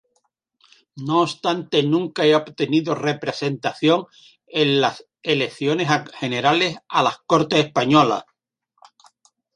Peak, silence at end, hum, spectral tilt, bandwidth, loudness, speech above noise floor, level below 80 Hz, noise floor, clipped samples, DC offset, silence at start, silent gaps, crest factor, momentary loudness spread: -2 dBFS; 1.35 s; none; -5.5 dB/octave; 10.5 kHz; -20 LUFS; 52 dB; -66 dBFS; -71 dBFS; under 0.1%; under 0.1%; 0.95 s; none; 20 dB; 7 LU